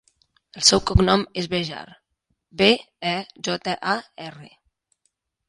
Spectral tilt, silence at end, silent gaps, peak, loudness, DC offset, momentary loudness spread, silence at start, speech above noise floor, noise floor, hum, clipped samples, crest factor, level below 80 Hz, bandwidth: -3.5 dB/octave; 1 s; none; 0 dBFS; -21 LUFS; under 0.1%; 21 LU; 0.55 s; 52 dB; -74 dBFS; none; under 0.1%; 24 dB; -36 dBFS; 11.5 kHz